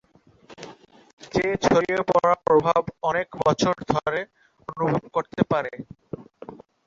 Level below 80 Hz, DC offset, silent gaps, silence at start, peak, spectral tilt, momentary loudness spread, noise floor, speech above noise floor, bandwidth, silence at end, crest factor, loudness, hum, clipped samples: -54 dBFS; under 0.1%; 1.13-1.17 s; 0.5 s; -4 dBFS; -5.5 dB/octave; 23 LU; -53 dBFS; 31 dB; 7.8 kHz; 0.3 s; 20 dB; -23 LUFS; none; under 0.1%